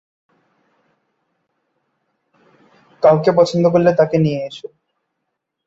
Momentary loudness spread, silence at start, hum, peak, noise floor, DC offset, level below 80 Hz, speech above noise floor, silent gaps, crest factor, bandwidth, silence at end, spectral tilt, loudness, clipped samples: 17 LU; 3 s; none; -2 dBFS; -76 dBFS; under 0.1%; -60 dBFS; 62 dB; none; 18 dB; 8 kHz; 1.1 s; -7.5 dB/octave; -15 LUFS; under 0.1%